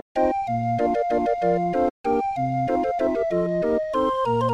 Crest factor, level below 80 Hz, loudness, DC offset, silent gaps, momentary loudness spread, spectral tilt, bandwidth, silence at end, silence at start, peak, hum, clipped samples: 14 dB; -50 dBFS; -23 LUFS; under 0.1%; 1.90-2.04 s; 2 LU; -8 dB/octave; 10 kHz; 0 s; 0.15 s; -8 dBFS; none; under 0.1%